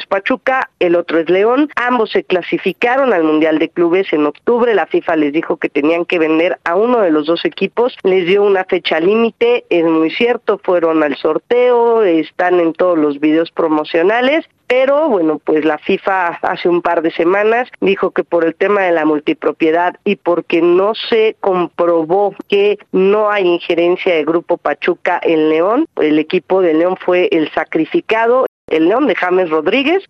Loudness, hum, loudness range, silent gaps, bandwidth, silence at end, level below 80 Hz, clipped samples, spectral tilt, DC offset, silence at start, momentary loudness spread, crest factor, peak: -14 LUFS; none; 1 LU; 28.48-28.68 s; 6.4 kHz; 0.1 s; -60 dBFS; under 0.1%; -7 dB/octave; under 0.1%; 0 s; 4 LU; 12 dB; 0 dBFS